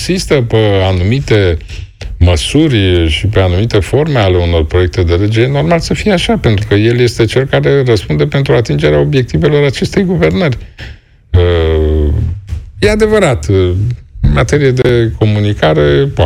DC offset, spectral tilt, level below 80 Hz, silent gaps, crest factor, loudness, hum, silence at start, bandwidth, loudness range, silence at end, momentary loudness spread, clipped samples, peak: under 0.1%; -6.5 dB/octave; -22 dBFS; none; 10 dB; -11 LUFS; none; 0 s; 13 kHz; 2 LU; 0 s; 6 LU; under 0.1%; 0 dBFS